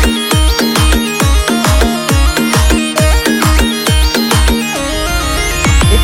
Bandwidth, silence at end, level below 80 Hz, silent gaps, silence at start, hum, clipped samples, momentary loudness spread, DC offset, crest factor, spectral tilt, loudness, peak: 17 kHz; 0 s; -14 dBFS; none; 0 s; none; under 0.1%; 3 LU; under 0.1%; 10 dB; -4 dB/octave; -11 LUFS; 0 dBFS